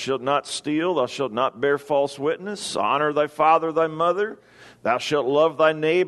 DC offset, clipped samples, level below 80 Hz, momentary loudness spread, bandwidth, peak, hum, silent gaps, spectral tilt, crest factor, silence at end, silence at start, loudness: under 0.1%; under 0.1%; -68 dBFS; 8 LU; 12.5 kHz; -4 dBFS; none; none; -4.5 dB/octave; 18 dB; 0 s; 0 s; -22 LUFS